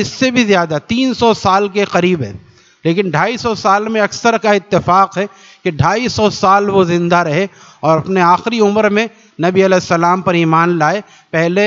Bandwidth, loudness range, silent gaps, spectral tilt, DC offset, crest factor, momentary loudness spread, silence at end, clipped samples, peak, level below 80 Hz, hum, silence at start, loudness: 7.8 kHz; 2 LU; none; -5.5 dB/octave; under 0.1%; 14 dB; 8 LU; 0 s; under 0.1%; 0 dBFS; -48 dBFS; none; 0 s; -13 LUFS